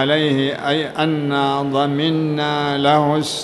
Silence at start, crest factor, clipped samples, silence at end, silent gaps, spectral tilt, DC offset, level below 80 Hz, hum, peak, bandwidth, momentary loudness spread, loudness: 0 s; 16 dB; under 0.1%; 0 s; none; -5.5 dB/octave; under 0.1%; -58 dBFS; none; -2 dBFS; 12 kHz; 4 LU; -18 LUFS